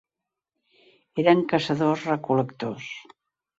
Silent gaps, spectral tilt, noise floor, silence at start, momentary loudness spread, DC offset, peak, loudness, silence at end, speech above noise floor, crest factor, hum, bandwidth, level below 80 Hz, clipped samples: none; -7 dB/octave; -87 dBFS; 1.15 s; 15 LU; under 0.1%; -4 dBFS; -24 LUFS; 0.6 s; 64 dB; 22 dB; none; 7.8 kHz; -68 dBFS; under 0.1%